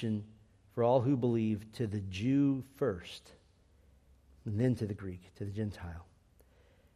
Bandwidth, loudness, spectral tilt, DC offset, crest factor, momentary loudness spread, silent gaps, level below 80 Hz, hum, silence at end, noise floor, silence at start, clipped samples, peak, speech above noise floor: 13.5 kHz; -34 LUFS; -8.5 dB/octave; under 0.1%; 20 dB; 18 LU; none; -64 dBFS; none; 0.9 s; -65 dBFS; 0 s; under 0.1%; -16 dBFS; 32 dB